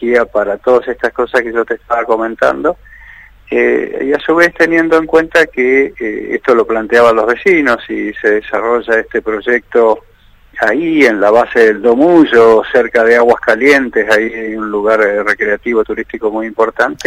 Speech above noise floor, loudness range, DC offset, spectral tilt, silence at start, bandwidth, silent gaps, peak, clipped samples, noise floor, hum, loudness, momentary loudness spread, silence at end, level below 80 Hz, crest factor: 28 dB; 5 LU; under 0.1%; -5 dB/octave; 0 s; 12.5 kHz; none; 0 dBFS; 0.3%; -39 dBFS; none; -11 LUFS; 9 LU; 0 s; -44 dBFS; 12 dB